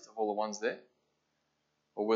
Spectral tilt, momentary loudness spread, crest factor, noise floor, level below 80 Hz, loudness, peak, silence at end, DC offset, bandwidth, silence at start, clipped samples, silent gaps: -4 dB/octave; 14 LU; 20 dB; -80 dBFS; under -90 dBFS; -36 LUFS; -16 dBFS; 0 s; under 0.1%; 7.8 kHz; 0 s; under 0.1%; none